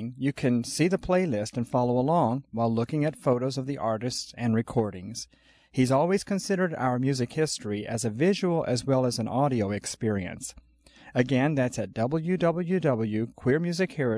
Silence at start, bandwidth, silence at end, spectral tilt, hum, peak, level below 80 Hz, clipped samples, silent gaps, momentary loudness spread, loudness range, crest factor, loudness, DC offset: 0 s; 11 kHz; 0 s; -6 dB/octave; none; -10 dBFS; -58 dBFS; under 0.1%; none; 7 LU; 2 LU; 16 dB; -27 LUFS; under 0.1%